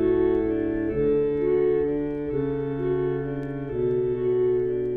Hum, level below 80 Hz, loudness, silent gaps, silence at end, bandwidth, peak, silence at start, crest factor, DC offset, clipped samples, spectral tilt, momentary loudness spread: none; -44 dBFS; -25 LUFS; none; 0 s; 3.7 kHz; -12 dBFS; 0 s; 12 dB; under 0.1%; under 0.1%; -11 dB/octave; 6 LU